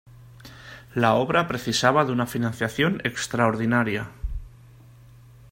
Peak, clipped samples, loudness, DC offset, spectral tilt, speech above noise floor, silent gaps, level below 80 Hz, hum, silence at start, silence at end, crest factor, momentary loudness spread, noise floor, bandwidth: -4 dBFS; under 0.1%; -23 LUFS; under 0.1%; -5 dB/octave; 26 dB; none; -44 dBFS; none; 0.2 s; 1.05 s; 22 dB; 16 LU; -49 dBFS; 16.5 kHz